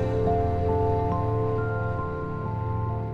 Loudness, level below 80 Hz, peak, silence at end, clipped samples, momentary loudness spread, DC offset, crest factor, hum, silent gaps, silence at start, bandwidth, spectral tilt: -27 LUFS; -38 dBFS; -12 dBFS; 0 s; under 0.1%; 6 LU; under 0.1%; 14 dB; none; none; 0 s; 5.2 kHz; -10 dB/octave